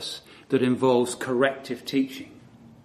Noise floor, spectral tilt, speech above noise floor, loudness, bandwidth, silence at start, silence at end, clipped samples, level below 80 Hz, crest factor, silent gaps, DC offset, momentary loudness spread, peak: -50 dBFS; -5 dB/octave; 26 dB; -25 LUFS; 14 kHz; 0 s; 0.15 s; under 0.1%; -66 dBFS; 20 dB; none; under 0.1%; 16 LU; -6 dBFS